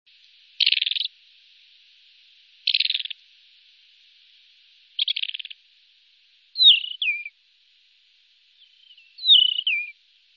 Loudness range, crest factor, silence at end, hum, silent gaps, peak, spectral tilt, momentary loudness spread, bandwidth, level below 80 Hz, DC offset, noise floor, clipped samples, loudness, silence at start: 9 LU; 22 dB; 0.45 s; none; none; -4 dBFS; 7.5 dB/octave; 22 LU; 6.2 kHz; under -90 dBFS; under 0.1%; -61 dBFS; under 0.1%; -19 LUFS; 0.6 s